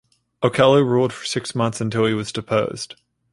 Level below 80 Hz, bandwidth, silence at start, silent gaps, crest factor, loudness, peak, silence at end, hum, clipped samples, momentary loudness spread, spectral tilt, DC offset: -56 dBFS; 11.5 kHz; 0.4 s; none; 18 dB; -20 LUFS; -2 dBFS; 0.4 s; none; under 0.1%; 11 LU; -5.5 dB/octave; under 0.1%